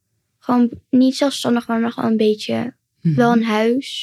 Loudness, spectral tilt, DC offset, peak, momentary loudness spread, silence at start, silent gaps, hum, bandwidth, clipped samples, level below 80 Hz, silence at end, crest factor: -18 LUFS; -6 dB/octave; under 0.1%; -2 dBFS; 9 LU; 0.5 s; none; none; 13 kHz; under 0.1%; -62 dBFS; 0 s; 16 dB